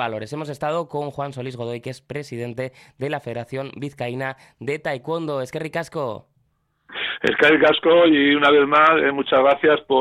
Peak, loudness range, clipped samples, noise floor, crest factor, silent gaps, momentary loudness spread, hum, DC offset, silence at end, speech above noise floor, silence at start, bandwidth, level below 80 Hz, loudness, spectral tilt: -4 dBFS; 13 LU; under 0.1%; -67 dBFS; 16 dB; none; 17 LU; none; under 0.1%; 0 s; 47 dB; 0 s; 12.5 kHz; -60 dBFS; -20 LUFS; -6 dB/octave